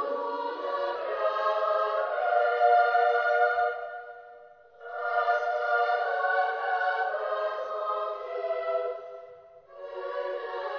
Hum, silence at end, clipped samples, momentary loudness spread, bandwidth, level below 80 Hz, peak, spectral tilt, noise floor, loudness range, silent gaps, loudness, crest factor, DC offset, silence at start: none; 0 s; under 0.1%; 16 LU; 6.6 kHz; -80 dBFS; -12 dBFS; -2.5 dB/octave; -52 dBFS; 7 LU; none; -28 LUFS; 16 dB; under 0.1%; 0 s